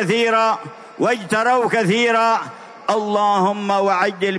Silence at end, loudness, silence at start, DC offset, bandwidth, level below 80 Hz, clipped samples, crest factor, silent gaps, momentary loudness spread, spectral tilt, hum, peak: 0 s; -18 LUFS; 0 s; under 0.1%; 11 kHz; -72 dBFS; under 0.1%; 14 dB; none; 7 LU; -4.5 dB/octave; none; -4 dBFS